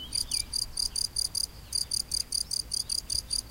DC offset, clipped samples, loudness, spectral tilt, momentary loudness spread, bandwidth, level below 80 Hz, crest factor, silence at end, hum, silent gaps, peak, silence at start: under 0.1%; under 0.1%; -29 LUFS; 0.5 dB/octave; 2 LU; 17 kHz; -48 dBFS; 18 dB; 0 s; none; none; -16 dBFS; 0 s